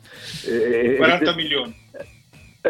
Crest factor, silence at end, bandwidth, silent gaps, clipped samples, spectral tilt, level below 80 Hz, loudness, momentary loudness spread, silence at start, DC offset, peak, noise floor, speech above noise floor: 20 dB; 0 s; 16 kHz; none; under 0.1%; -4.5 dB/octave; -54 dBFS; -19 LUFS; 24 LU; 0.1 s; under 0.1%; -2 dBFS; -49 dBFS; 29 dB